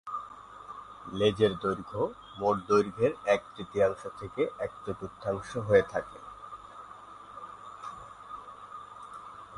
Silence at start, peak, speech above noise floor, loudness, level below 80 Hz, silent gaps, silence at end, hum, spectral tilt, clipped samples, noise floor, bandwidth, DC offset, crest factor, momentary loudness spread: 0.05 s; -10 dBFS; 19 dB; -30 LUFS; -60 dBFS; none; 0 s; none; -6 dB/octave; under 0.1%; -48 dBFS; 11.5 kHz; under 0.1%; 22 dB; 20 LU